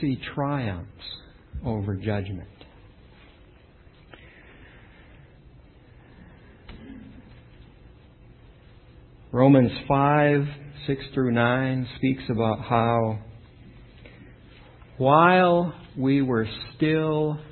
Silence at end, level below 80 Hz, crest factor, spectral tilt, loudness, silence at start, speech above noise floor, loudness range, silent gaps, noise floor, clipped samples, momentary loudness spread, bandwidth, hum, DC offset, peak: 0.05 s; -50 dBFS; 22 dB; -11.5 dB/octave; -23 LUFS; 0 s; 30 dB; 12 LU; none; -52 dBFS; under 0.1%; 21 LU; 4.4 kHz; none; under 0.1%; -4 dBFS